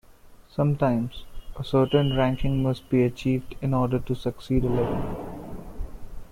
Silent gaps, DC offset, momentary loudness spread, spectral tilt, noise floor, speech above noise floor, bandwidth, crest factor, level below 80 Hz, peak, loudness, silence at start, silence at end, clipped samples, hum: none; under 0.1%; 18 LU; -8.5 dB/octave; -49 dBFS; 26 dB; 14.5 kHz; 18 dB; -38 dBFS; -8 dBFS; -25 LUFS; 0.25 s; 0 s; under 0.1%; none